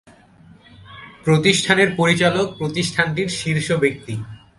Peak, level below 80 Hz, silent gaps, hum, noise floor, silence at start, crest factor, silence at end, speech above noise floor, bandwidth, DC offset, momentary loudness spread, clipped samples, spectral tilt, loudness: 0 dBFS; -52 dBFS; none; none; -48 dBFS; 0.85 s; 20 dB; 0.2 s; 30 dB; 11.5 kHz; under 0.1%; 14 LU; under 0.1%; -4.5 dB/octave; -18 LUFS